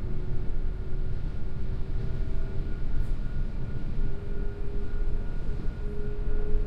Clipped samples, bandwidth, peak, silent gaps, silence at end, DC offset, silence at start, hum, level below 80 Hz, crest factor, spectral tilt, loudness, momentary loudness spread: under 0.1%; 4.2 kHz; -12 dBFS; none; 0 s; under 0.1%; 0 s; none; -28 dBFS; 14 dB; -9 dB/octave; -36 LUFS; 2 LU